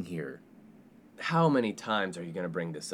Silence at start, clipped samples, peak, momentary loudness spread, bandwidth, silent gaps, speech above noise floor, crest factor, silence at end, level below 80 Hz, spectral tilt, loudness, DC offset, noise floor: 0 s; under 0.1%; -14 dBFS; 14 LU; 13 kHz; none; 25 dB; 18 dB; 0 s; -76 dBFS; -6 dB/octave; -31 LUFS; under 0.1%; -56 dBFS